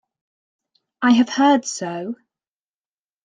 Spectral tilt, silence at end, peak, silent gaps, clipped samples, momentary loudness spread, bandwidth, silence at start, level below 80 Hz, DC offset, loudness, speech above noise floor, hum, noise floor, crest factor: -3.5 dB/octave; 1.1 s; -4 dBFS; none; under 0.1%; 16 LU; 9.6 kHz; 1 s; -68 dBFS; under 0.1%; -18 LUFS; over 73 dB; none; under -90 dBFS; 18 dB